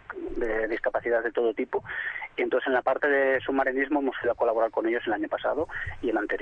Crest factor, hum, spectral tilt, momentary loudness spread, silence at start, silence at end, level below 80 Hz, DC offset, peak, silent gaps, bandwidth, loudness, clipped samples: 14 dB; none; -7 dB/octave; 7 LU; 0.1 s; 0 s; -50 dBFS; under 0.1%; -12 dBFS; none; 6.6 kHz; -27 LUFS; under 0.1%